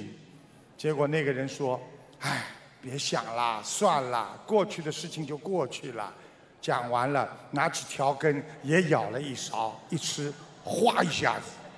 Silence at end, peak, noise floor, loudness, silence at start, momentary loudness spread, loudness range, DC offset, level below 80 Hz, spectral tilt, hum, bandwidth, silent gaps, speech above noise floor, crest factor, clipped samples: 0 s; -8 dBFS; -54 dBFS; -30 LUFS; 0 s; 11 LU; 3 LU; under 0.1%; -72 dBFS; -4.5 dB/octave; none; 11 kHz; none; 25 dB; 22 dB; under 0.1%